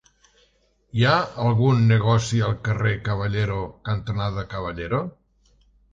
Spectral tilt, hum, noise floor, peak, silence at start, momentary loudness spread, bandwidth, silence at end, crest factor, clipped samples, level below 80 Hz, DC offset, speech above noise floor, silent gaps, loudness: -6.5 dB/octave; none; -63 dBFS; -6 dBFS; 0.95 s; 11 LU; 7.6 kHz; 0.85 s; 18 dB; under 0.1%; -44 dBFS; under 0.1%; 42 dB; none; -23 LUFS